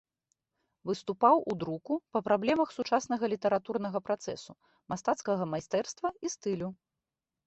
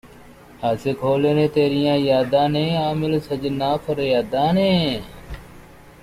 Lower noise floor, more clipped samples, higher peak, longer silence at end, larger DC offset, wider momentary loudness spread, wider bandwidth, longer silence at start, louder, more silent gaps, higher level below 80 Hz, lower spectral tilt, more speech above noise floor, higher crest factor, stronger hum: first, -89 dBFS vs -44 dBFS; neither; second, -10 dBFS vs -6 dBFS; first, 0.7 s vs 0.1 s; neither; about the same, 10 LU vs 9 LU; second, 8.2 kHz vs 15.5 kHz; first, 0.85 s vs 0.05 s; second, -31 LUFS vs -20 LUFS; neither; second, -70 dBFS vs -46 dBFS; second, -5 dB/octave vs -7 dB/octave; first, 58 dB vs 25 dB; first, 22 dB vs 14 dB; neither